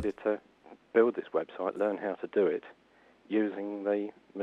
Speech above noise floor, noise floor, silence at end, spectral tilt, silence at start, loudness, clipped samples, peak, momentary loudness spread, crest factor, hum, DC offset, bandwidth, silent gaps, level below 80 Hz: 31 dB; -62 dBFS; 0 s; -7.5 dB/octave; 0 s; -32 LUFS; under 0.1%; -12 dBFS; 9 LU; 20 dB; none; under 0.1%; 5.6 kHz; none; -68 dBFS